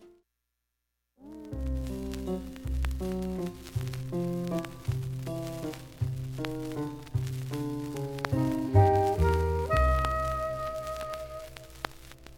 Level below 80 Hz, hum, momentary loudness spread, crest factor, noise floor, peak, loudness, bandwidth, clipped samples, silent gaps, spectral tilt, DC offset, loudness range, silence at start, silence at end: -38 dBFS; none; 14 LU; 22 dB; -83 dBFS; -8 dBFS; -31 LUFS; 17 kHz; under 0.1%; none; -7 dB/octave; under 0.1%; 8 LU; 0 s; 0 s